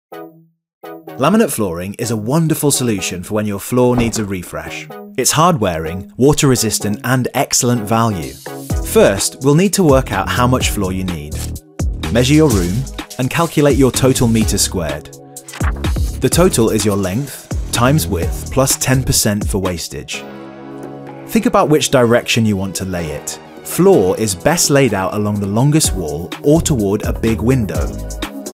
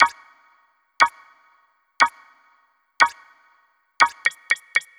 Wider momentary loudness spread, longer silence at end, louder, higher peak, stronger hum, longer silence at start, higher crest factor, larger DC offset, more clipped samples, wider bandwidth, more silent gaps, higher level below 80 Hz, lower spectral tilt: first, 14 LU vs 3 LU; second, 0.05 s vs 0.2 s; first, -15 LUFS vs -20 LUFS; about the same, 0 dBFS vs 0 dBFS; neither; about the same, 0.1 s vs 0 s; second, 16 dB vs 24 dB; neither; neither; about the same, 16.5 kHz vs 15 kHz; first, 0.73-0.81 s vs none; first, -30 dBFS vs -70 dBFS; first, -4.5 dB/octave vs 0.5 dB/octave